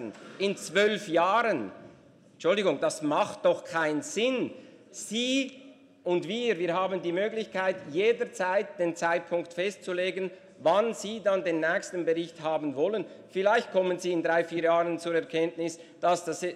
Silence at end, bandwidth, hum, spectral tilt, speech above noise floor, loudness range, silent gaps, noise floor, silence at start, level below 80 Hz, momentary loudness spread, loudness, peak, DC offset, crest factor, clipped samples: 0 s; 13.5 kHz; none; -4 dB/octave; 28 dB; 2 LU; none; -56 dBFS; 0 s; -80 dBFS; 7 LU; -28 LUFS; -12 dBFS; under 0.1%; 16 dB; under 0.1%